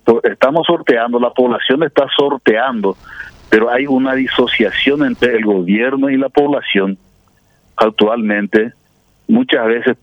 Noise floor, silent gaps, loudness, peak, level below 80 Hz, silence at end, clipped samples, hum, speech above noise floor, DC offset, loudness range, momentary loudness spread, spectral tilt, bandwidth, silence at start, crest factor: -54 dBFS; none; -14 LUFS; 0 dBFS; -50 dBFS; 0.1 s; under 0.1%; none; 40 dB; under 0.1%; 2 LU; 7 LU; -6.5 dB/octave; 8.6 kHz; 0.05 s; 14 dB